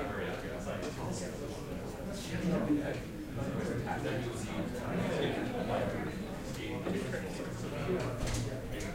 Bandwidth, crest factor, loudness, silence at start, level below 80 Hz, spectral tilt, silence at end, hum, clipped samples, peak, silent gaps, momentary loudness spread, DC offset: 16 kHz; 16 dB; -37 LUFS; 0 s; -48 dBFS; -6 dB/octave; 0 s; none; under 0.1%; -20 dBFS; none; 7 LU; under 0.1%